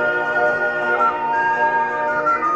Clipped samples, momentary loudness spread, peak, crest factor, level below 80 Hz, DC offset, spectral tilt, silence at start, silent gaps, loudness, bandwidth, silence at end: under 0.1%; 2 LU; -6 dBFS; 12 dB; -56 dBFS; under 0.1%; -5 dB/octave; 0 s; none; -18 LUFS; 8.2 kHz; 0 s